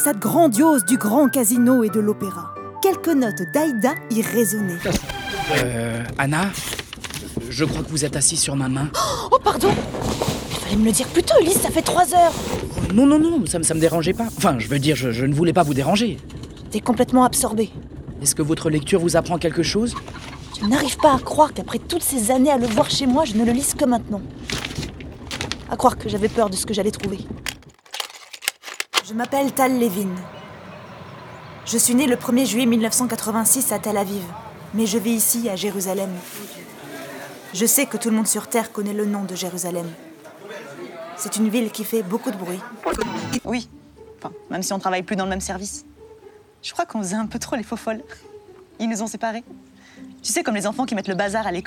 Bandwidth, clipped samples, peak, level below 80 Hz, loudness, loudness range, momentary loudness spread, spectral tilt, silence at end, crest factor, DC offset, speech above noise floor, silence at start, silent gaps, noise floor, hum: over 20 kHz; under 0.1%; 0 dBFS; -44 dBFS; -20 LUFS; 8 LU; 17 LU; -4 dB/octave; 0 s; 20 dB; under 0.1%; 26 dB; 0 s; none; -46 dBFS; none